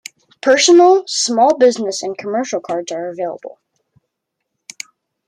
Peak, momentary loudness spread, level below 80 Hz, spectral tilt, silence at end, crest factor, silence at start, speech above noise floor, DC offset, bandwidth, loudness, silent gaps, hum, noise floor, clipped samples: -2 dBFS; 23 LU; -68 dBFS; -2 dB/octave; 1.8 s; 14 dB; 0.45 s; 62 dB; under 0.1%; 11 kHz; -14 LUFS; none; none; -76 dBFS; under 0.1%